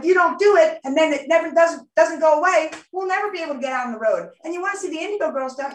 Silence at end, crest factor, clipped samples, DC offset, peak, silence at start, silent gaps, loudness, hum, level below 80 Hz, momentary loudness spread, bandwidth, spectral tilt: 0 s; 16 dB; under 0.1%; under 0.1%; -4 dBFS; 0 s; none; -20 LUFS; none; -72 dBFS; 11 LU; 9.8 kHz; -2.5 dB/octave